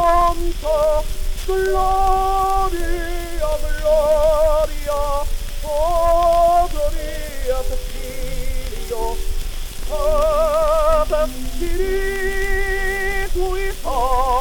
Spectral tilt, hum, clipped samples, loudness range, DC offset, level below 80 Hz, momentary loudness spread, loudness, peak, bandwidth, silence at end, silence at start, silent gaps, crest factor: -4.5 dB/octave; none; under 0.1%; 5 LU; under 0.1%; -22 dBFS; 13 LU; -20 LUFS; -4 dBFS; 19 kHz; 0 s; 0 s; none; 14 dB